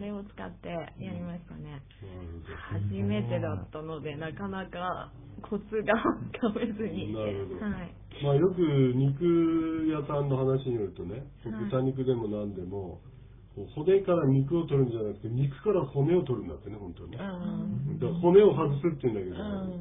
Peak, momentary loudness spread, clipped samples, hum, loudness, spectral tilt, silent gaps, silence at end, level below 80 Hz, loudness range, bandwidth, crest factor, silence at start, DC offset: -10 dBFS; 17 LU; under 0.1%; none; -29 LUFS; -12 dB/octave; none; 0 s; -52 dBFS; 8 LU; 3.8 kHz; 20 dB; 0 s; under 0.1%